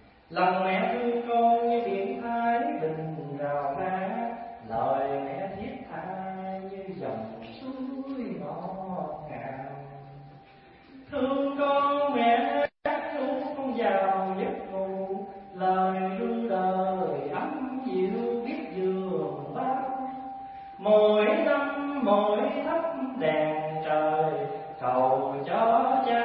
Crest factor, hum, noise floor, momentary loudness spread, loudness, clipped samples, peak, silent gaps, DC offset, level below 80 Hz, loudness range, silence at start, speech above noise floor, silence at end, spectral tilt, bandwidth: 18 dB; none; -53 dBFS; 14 LU; -28 LUFS; under 0.1%; -10 dBFS; none; under 0.1%; -66 dBFS; 10 LU; 0.3 s; 28 dB; 0 s; -10 dB/octave; 5.4 kHz